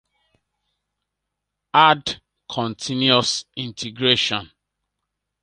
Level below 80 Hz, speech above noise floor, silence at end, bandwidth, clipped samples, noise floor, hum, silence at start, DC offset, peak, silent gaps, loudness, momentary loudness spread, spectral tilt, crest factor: -60 dBFS; 61 dB; 1 s; 11 kHz; under 0.1%; -81 dBFS; none; 1.75 s; under 0.1%; 0 dBFS; none; -19 LUFS; 15 LU; -3.5 dB/octave; 24 dB